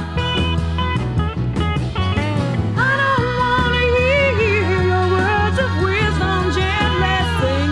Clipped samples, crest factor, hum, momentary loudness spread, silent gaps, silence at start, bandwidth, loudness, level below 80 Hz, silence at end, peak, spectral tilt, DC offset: under 0.1%; 12 dB; none; 5 LU; none; 0 s; 11.5 kHz; -17 LUFS; -30 dBFS; 0 s; -4 dBFS; -6 dB/octave; under 0.1%